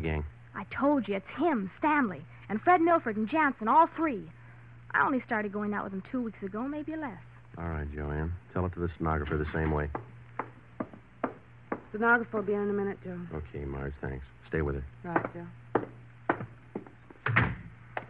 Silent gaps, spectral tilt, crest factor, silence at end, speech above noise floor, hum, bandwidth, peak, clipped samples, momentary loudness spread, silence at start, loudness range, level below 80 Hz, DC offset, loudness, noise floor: none; -9.5 dB/octave; 20 dB; 0 s; 21 dB; none; 5 kHz; -10 dBFS; under 0.1%; 16 LU; 0 s; 8 LU; -46 dBFS; under 0.1%; -31 LUFS; -51 dBFS